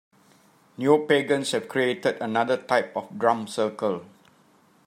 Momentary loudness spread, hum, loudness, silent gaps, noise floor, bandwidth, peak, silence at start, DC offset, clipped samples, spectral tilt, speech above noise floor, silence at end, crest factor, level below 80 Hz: 7 LU; none; -25 LUFS; none; -59 dBFS; 13.5 kHz; -6 dBFS; 0.8 s; under 0.1%; under 0.1%; -4.5 dB/octave; 35 dB; 0.8 s; 20 dB; -76 dBFS